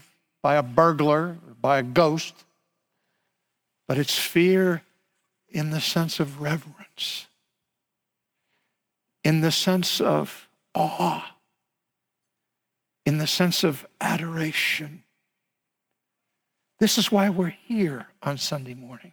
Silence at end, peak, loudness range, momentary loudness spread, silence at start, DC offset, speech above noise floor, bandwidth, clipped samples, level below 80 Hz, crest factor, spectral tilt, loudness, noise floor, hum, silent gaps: 0.05 s; -6 dBFS; 5 LU; 13 LU; 0.45 s; under 0.1%; 59 dB; over 20 kHz; under 0.1%; -66 dBFS; 20 dB; -4.5 dB/octave; -24 LUFS; -83 dBFS; none; none